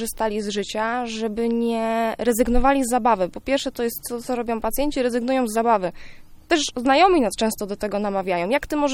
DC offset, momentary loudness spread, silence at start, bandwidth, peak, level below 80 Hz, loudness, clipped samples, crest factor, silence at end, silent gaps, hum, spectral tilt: under 0.1%; 7 LU; 0 s; 17 kHz; -4 dBFS; -36 dBFS; -22 LUFS; under 0.1%; 18 dB; 0 s; none; none; -4 dB/octave